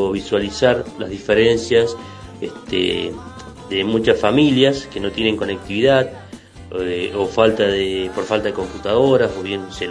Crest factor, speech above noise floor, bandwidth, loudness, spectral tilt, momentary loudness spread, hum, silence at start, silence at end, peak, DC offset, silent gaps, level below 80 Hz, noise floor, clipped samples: 18 dB; 20 dB; 10.5 kHz; -18 LUFS; -5.5 dB/octave; 15 LU; none; 0 s; 0 s; 0 dBFS; under 0.1%; none; -44 dBFS; -38 dBFS; under 0.1%